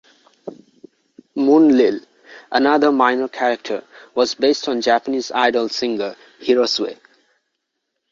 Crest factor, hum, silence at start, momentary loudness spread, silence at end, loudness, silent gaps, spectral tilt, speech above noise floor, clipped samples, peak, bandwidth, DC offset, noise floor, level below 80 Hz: 18 dB; none; 0.45 s; 15 LU; 1.2 s; -18 LUFS; none; -3.5 dB/octave; 59 dB; under 0.1%; -2 dBFS; 7.6 kHz; under 0.1%; -76 dBFS; -64 dBFS